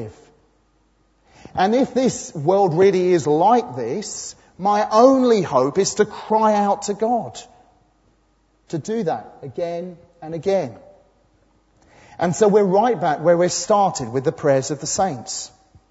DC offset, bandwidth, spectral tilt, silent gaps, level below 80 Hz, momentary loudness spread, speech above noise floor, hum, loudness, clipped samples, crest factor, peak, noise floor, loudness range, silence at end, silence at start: under 0.1%; 8 kHz; -5 dB/octave; none; -58 dBFS; 15 LU; 42 dB; none; -19 LUFS; under 0.1%; 20 dB; 0 dBFS; -61 dBFS; 10 LU; 0.45 s; 0 s